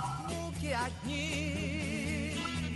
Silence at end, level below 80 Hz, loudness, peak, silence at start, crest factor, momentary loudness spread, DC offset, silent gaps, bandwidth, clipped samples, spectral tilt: 0 s; -52 dBFS; -35 LUFS; -20 dBFS; 0 s; 14 dB; 3 LU; under 0.1%; none; 12 kHz; under 0.1%; -4.5 dB/octave